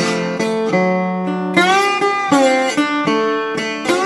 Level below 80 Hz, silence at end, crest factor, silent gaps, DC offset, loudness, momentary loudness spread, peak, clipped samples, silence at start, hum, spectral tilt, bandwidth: -62 dBFS; 0 s; 16 dB; none; under 0.1%; -16 LUFS; 6 LU; 0 dBFS; under 0.1%; 0 s; none; -4.5 dB/octave; 13 kHz